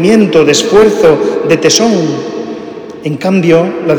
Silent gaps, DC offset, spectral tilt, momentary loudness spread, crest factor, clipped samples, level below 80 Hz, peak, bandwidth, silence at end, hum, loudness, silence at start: none; under 0.1%; -4.5 dB/octave; 14 LU; 8 dB; 1%; -44 dBFS; 0 dBFS; 20 kHz; 0 s; none; -9 LUFS; 0 s